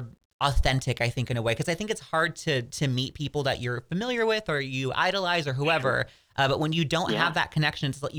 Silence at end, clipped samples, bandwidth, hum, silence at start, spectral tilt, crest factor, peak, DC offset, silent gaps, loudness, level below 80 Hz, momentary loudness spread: 0 s; under 0.1%; over 20 kHz; none; 0 s; -5 dB/octave; 20 dB; -6 dBFS; under 0.1%; 0.25-0.39 s; -27 LUFS; -40 dBFS; 5 LU